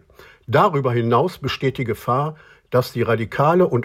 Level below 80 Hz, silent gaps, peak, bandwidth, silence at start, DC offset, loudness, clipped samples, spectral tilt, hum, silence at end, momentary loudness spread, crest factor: -52 dBFS; none; -4 dBFS; 16 kHz; 0.5 s; under 0.1%; -20 LUFS; under 0.1%; -7.5 dB/octave; none; 0 s; 6 LU; 16 dB